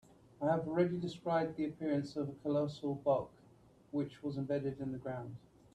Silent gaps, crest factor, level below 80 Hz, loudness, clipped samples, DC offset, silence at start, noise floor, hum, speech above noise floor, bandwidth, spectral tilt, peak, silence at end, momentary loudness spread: none; 18 dB; -70 dBFS; -37 LUFS; under 0.1%; under 0.1%; 0.4 s; -64 dBFS; none; 27 dB; 9.8 kHz; -8 dB/octave; -20 dBFS; 0.35 s; 9 LU